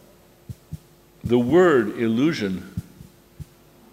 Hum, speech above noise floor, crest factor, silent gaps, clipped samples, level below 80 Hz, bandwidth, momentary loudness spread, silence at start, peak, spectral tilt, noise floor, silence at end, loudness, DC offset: none; 31 dB; 16 dB; none; under 0.1%; -50 dBFS; 15 kHz; 25 LU; 0.5 s; -6 dBFS; -7 dB/octave; -50 dBFS; 0.5 s; -20 LUFS; under 0.1%